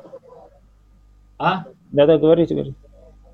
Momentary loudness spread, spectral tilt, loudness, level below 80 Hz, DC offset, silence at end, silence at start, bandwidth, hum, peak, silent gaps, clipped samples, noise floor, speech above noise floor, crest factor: 13 LU; -9 dB/octave; -18 LUFS; -50 dBFS; under 0.1%; 0.6 s; 0.15 s; 5.8 kHz; none; -2 dBFS; none; under 0.1%; -51 dBFS; 35 dB; 18 dB